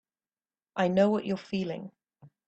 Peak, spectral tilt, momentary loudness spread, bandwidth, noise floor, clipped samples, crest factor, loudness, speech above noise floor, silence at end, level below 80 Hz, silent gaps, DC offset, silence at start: -12 dBFS; -7.5 dB/octave; 16 LU; 8.2 kHz; under -90 dBFS; under 0.1%; 18 dB; -29 LUFS; over 62 dB; 0.2 s; -70 dBFS; none; under 0.1%; 0.75 s